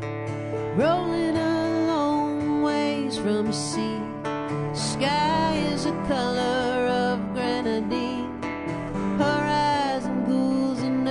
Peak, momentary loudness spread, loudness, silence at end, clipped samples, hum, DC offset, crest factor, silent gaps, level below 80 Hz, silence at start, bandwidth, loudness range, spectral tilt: -10 dBFS; 8 LU; -25 LUFS; 0 s; under 0.1%; none; under 0.1%; 14 dB; none; -50 dBFS; 0 s; 11 kHz; 1 LU; -5.5 dB/octave